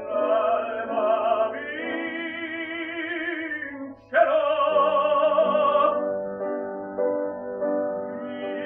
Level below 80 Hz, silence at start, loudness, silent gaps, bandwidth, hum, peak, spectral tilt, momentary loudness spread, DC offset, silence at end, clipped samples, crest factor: -68 dBFS; 0 s; -24 LUFS; none; 3.8 kHz; none; -8 dBFS; -7.5 dB/octave; 11 LU; under 0.1%; 0 s; under 0.1%; 18 dB